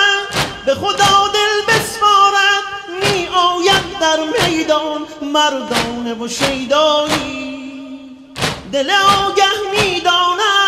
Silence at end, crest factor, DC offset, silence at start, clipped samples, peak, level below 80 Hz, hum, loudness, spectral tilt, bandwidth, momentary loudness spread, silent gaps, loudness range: 0 s; 14 dB; under 0.1%; 0 s; under 0.1%; 0 dBFS; -44 dBFS; none; -14 LUFS; -2.5 dB/octave; 16 kHz; 12 LU; none; 4 LU